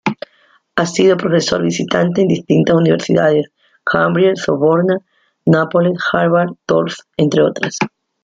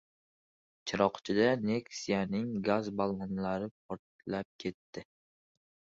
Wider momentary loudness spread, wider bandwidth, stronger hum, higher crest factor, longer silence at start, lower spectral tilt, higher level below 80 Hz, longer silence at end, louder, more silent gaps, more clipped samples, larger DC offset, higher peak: second, 9 LU vs 16 LU; first, 9 kHz vs 7.8 kHz; neither; second, 14 dB vs 22 dB; second, 0.05 s vs 0.85 s; about the same, -6 dB/octave vs -6 dB/octave; first, -54 dBFS vs -66 dBFS; second, 0.35 s vs 0.95 s; first, -15 LUFS vs -34 LUFS; second, none vs 3.71-3.89 s, 3.99-4.19 s, 4.45-4.59 s, 4.74-4.93 s; neither; neither; first, 0 dBFS vs -12 dBFS